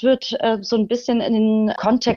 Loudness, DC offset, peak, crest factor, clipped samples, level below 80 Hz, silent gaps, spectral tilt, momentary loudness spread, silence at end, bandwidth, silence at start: -19 LUFS; under 0.1%; -4 dBFS; 14 dB; under 0.1%; -54 dBFS; none; -5.5 dB/octave; 3 LU; 0 s; 7 kHz; 0 s